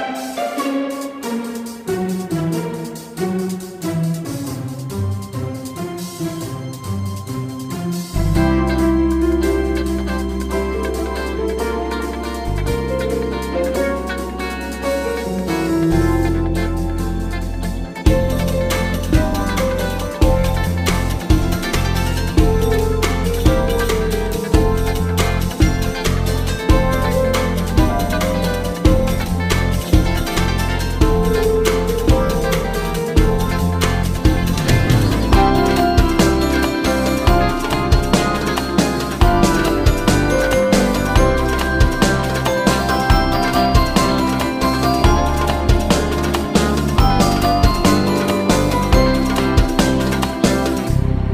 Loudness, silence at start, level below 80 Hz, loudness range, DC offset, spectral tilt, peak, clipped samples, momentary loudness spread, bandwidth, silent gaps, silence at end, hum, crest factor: -18 LUFS; 0 s; -22 dBFS; 7 LU; under 0.1%; -5.5 dB/octave; 0 dBFS; under 0.1%; 9 LU; 16 kHz; none; 0 s; none; 16 dB